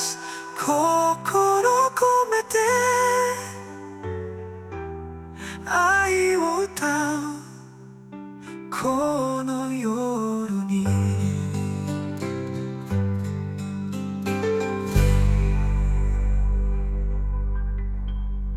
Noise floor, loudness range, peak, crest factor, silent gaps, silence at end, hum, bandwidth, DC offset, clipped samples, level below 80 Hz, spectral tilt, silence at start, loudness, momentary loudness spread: -44 dBFS; 6 LU; -6 dBFS; 16 dB; none; 0 s; none; 15 kHz; under 0.1%; under 0.1%; -30 dBFS; -5.5 dB/octave; 0 s; -24 LUFS; 16 LU